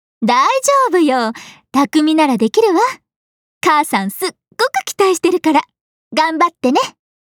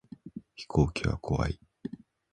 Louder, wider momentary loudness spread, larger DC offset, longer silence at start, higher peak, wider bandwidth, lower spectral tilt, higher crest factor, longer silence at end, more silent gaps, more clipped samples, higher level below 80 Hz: first, -15 LUFS vs -31 LUFS; second, 9 LU vs 18 LU; neither; about the same, 0.2 s vs 0.25 s; first, -2 dBFS vs -10 dBFS; first, 19.5 kHz vs 10 kHz; second, -3.5 dB/octave vs -7 dB/octave; second, 14 dB vs 22 dB; about the same, 0.3 s vs 0.35 s; first, 3.16-3.61 s, 5.81-6.11 s vs none; neither; second, -68 dBFS vs -42 dBFS